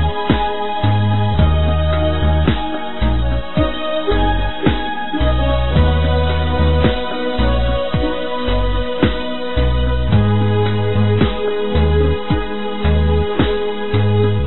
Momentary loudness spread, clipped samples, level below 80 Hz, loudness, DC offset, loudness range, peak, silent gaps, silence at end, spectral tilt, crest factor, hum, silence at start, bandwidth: 5 LU; under 0.1%; -20 dBFS; -17 LUFS; 6%; 2 LU; 0 dBFS; none; 0 s; -5.5 dB/octave; 14 dB; none; 0 s; 4.2 kHz